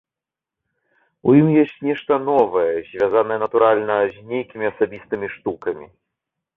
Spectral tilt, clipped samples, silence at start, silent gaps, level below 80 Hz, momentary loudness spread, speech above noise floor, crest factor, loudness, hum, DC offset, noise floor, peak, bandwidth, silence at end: -10 dB/octave; under 0.1%; 1.25 s; none; -60 dBFS; 12 LU; 69 dB; 18 dB; -19 LUFS; none; under 0.1%; -88 dBFS; -2 dBFS; 4 kHz; 0.7 s